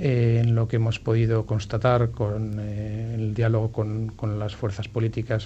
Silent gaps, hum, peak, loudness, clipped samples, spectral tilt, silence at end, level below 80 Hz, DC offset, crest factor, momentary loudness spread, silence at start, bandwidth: none; none; -6 dBFS; -25 LUFS; under 0.1%; -8 dB/octave; 0 s; -44 dBFS; under 0.1%; 18 dB; 8 LU; 0 s; 7.8 kHz